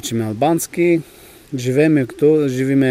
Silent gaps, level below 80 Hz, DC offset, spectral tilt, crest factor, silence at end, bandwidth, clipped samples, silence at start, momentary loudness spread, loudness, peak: none; -56 dBFS; under 0.1%; -6 dB/octave; 14 dB; 0 s; 16 kHz; under 0.1%; 0.05 s; 7 LU; -17 LUFS; -4 dBFS